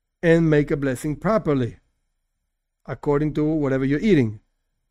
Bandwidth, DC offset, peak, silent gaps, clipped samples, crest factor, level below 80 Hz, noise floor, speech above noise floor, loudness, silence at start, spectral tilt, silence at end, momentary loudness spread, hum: 13.5 kHz; under 0.1%; -4 dBFS; none; under 0.1%; 18 dB; -44 dBFS; -76 dBFS; 56 dB; -21 LUFS; 0.25 s; -8 dB/octave; 0.55 s; 9 LU; none